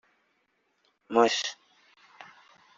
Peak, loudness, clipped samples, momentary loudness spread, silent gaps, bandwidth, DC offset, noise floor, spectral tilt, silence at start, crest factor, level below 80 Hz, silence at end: -6 dBFS; -26 LUFS; under 0.1%; 27 LU; none; 7.6 kHz; under 0.1%; -74 dBFS; -0.5 dB/octave; 1.1 s; 26 dB; -78 dBFS; 0.55 s